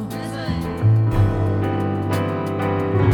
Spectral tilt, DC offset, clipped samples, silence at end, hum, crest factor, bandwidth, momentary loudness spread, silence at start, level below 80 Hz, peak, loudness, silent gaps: -8 dB/octave; under 0.1%; under 0.1%; 0 s; none; 14 dB; 13.5 kHz; 8 LU; 0 s; -36 dBFS; -6 dBFS; -21 LUFS; none